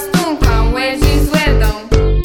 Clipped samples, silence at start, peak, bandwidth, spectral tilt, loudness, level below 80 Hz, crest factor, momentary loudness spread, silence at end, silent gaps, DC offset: under 0.1%; 0 s; 0 dBFS; 18 kHz; -5.5 dB/octave; -14 LUFS; -14 dBFS; 12 dB; 3 LU; 0 s; none; under 0.1%